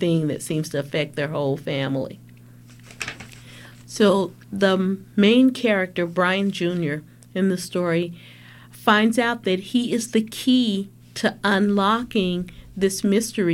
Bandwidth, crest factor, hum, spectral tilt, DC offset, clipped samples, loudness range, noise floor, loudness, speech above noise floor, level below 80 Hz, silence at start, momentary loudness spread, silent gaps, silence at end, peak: 16 kHz; 18 dB; none; -5 dB/octave; under 0.1%; under 0.1%; 6 LU; -46 dBFS; -22 LUFS; 25 dB; -56 dBFS; 0 s; 14 LU; none; 0 s; -4 dBFS